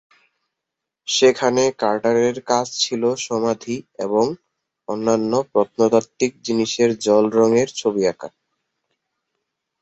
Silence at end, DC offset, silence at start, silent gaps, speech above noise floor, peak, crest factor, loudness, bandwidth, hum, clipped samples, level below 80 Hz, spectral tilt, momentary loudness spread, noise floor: 1.55 s; under 0.1%; 1.05 s; none; 64 dB; -2 dBFS; 18 dB; -19 LUFS; 8.2 kHz; none; under 0.1%; -62 dBFS; -4 dB/octave; 11 LU; -83 dBFS